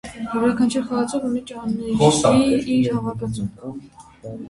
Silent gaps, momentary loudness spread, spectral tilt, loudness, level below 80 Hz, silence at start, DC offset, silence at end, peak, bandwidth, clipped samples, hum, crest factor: none; 19 LU; -5.5 dB/octave; -20 LUFS; -48 dBFS; 0.05 s; under 0.1%; 0 s; -2 dBFS; 11.5 kHz; under 0.1%; none; 20 dB